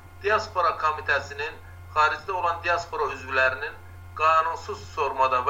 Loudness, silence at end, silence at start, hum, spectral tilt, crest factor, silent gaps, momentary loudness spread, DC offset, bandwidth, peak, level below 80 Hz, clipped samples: -25 LUFS; 0 s; 0 s; none; -3.5 dB/octave; 18 dB; none; 12 LU; under 0.1%; 16 kHz; -8 dBFS; -52 dBFS; under 0.1%